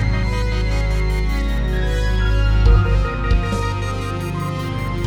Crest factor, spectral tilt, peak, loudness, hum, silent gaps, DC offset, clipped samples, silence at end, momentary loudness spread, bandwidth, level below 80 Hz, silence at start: 14 dB; -6.5 dB/octave; -2 dBFS; -20 LUFS; none; none; under 0.1%; under 0.1%; 0 s; 8 LU; 10.5 kHz; -18 dBFS; 0 s